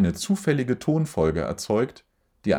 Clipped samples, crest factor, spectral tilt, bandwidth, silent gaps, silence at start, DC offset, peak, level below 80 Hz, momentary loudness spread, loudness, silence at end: under 0.1%; 18 dB; -6 dB/octave; over 20 kHz; none; 0 s; under 0.1%; -6 dBFS; -50 dBFS; 6 LU; -25 LUFS; 0 s